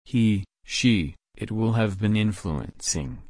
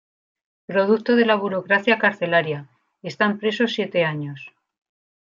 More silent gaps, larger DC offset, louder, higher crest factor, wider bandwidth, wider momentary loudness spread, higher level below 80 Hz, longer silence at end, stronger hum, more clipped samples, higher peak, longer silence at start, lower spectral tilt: neither; neither; second, -25 LUFS vs -20 LUFS; about the same, 16 dB vs 20 dB; first, 10.5 kHz vs 7.4 kHz; second, 10 LU vs 15 LU; first, -44 dBFS vs -72 dBFS; second, 0 s vs 0.75 s; neither; neither; second, -8 dBFS vs -2 dBFS; second, 0.1 s vs 0.7 s; second, -5 dB/octave vs -6.5 dB/octave